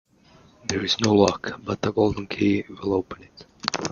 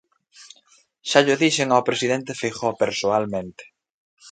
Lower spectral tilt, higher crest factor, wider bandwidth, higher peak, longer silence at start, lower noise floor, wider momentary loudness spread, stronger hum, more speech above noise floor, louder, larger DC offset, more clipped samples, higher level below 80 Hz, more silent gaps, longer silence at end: first, -5 dB/octave vs -3.5 dB/octave; about the same, 24 dB vs 22 dB; second, 7.4 kHz vs 9.4 kHz; about the same, 0 dBFS vs -2 dBFS; first, 0.65 s vs 0.4 s; second, -54 dBFS vs -58 dBFS; about the same, 12 LU vs 11 LU; neither; second, 31 dB vs 38 dB; second, -24 LUFS vs -21 LUFS; neither; neither; first, -54 dBFS vs -62 dBFS; second, none vs 3.94-4.17 s; about the same, 0 s vs 0 s